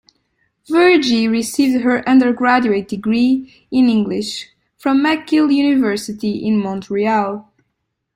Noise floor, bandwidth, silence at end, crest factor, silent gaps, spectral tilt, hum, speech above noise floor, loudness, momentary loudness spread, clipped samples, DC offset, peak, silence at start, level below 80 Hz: -73 dBFS; 15.5 kHz; 0.75 s; 14 dB; none; -5 dB/octave; none; 58 dB; -16 LUFS; 9 LU; under 0.1%; under 0.1%; -2 dBFS; 0.7 s; -56 dBFS